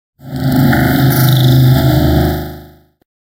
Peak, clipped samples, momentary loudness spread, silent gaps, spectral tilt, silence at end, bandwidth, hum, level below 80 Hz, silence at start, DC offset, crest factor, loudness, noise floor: 0 dBFS; under 0.1%; 12 LU; none; -6.5 dB/octave; 0.65 s; 16.5 kHz; none; -26 dBFS; 0.25 s; under 0.1%; 12 dB; -11 LUFS; -37 dBFS